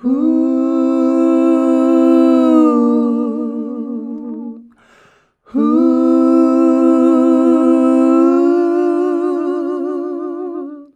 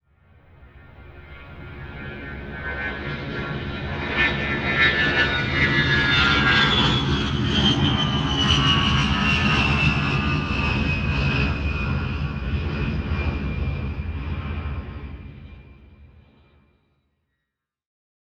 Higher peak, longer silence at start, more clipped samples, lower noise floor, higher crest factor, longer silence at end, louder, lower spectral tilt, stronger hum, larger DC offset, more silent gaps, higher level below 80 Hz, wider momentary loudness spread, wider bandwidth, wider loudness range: first, -2 dBFS vs -6 dBFS; second, 0.05 s vs 0.6 s; neither; second, -51 dBFS vs -82 dBFS; second, 12 dB vs 18 dB; second, 0.1 s vs 2.2 s; first, -13 LUFS vs -21 LUFS; first, -7 dB/octave vs -5 dB/octave; neither; neither; neither; second, -66 dBFS vs -32 dBFS; second, 13 LU vs 17 LU; about the same, 8.6 kHz vs 8.8 kHz; second, 6 LU vs 15 LU